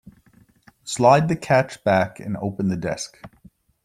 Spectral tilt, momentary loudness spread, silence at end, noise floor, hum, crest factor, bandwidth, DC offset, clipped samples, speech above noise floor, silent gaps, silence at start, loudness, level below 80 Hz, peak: -5.5 dB/octave; 15 LU; 0.6 s; -56 dBFS; none; 20 dB; 13.5 kHz; under 0.1%; under 0.1%; 35 dB; none; 0.85 s; -21 LUFS; -56 dBFS; -2 dBFS